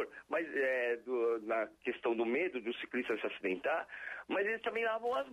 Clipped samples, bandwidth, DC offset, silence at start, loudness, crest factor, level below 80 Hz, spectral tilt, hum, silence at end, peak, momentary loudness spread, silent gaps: under 0.1%; 12.5 kHz; under 0.1%; 0 s; -36 LUFS; 12 dB; -78 dBFS; -5 dB/octave; none; 0 s; -24 dBFS; 5 LU; none